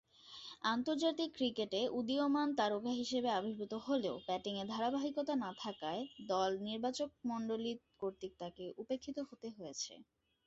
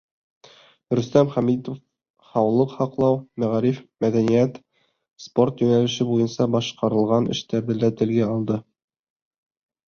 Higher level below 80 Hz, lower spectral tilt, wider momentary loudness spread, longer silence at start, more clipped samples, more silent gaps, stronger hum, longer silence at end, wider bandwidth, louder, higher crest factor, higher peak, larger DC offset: second, -76 dBFS vs -58 dBFS; second, -3 dB/octave vs -7 dB/octave; first, 11 LU vs 7 LU; second, 0.25 s vs 0.9 s; neither; second, none vs 2.10-2.14 s; neither; second, 0.45 s vs 1.25 s; first, 8 kHz vs 7 kHz; second, -39 LUFS vs -22 LUFS; about the same, 18 dB vs 20 dB; second, -22 dBFS vs -2 dBFS; neither